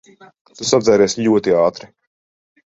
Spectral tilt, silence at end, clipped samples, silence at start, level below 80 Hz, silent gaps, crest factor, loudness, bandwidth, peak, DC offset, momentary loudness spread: -4.5 dB/octave; 1 s; under 0.1%; 0.6 s; -56 dBFS; none; 16 dB; -15 LUFS; 8 kHz; -2 dBFS; under 0.1%; 9 LU